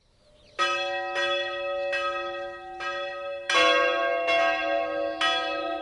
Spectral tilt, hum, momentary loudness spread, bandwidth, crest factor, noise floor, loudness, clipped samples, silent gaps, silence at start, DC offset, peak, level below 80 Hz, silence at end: -1 dB/octave; none; 12 LU; 11.5 kHz; 18 dB; -58 dBFS; -26 LUFS; under 0.1%; none; 0.6 s; under 0.1%; -10 dBFS; -62 dBFS; 0 s